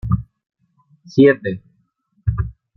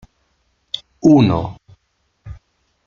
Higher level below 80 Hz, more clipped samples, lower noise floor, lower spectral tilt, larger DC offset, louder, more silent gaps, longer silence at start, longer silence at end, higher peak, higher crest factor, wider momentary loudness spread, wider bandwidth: first, -36 dBFS vs -46 dBFS; neither; about the same, -64 dBFS vs -66 dBFS; first, -9 dB/octave vs -7.5 dB/octave; neither; about the same, -18 LUFS vs -16 LUFS; neither; second, 0.05 s vs 0.75 s; second, 0.25 s vs 0.5 s; about the same, -2 dBFS vs -2 dBFS; about the same, 18 dB vs 18 dB; second, 14 LU vs 27 LU; second, 6.2 kHz vs 7 kHz